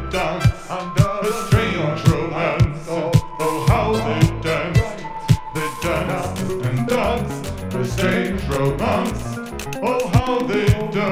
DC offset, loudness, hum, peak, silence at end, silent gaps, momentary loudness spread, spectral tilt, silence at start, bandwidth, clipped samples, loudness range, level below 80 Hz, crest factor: under 0.1%; -20 LUFS; none; -2 dBFS; 0 s; none; 7 LU; -6.5 dB/octave; 0 s; 16 kHz; under 0.1%; 3 LU; -32 dBFS; 18 dB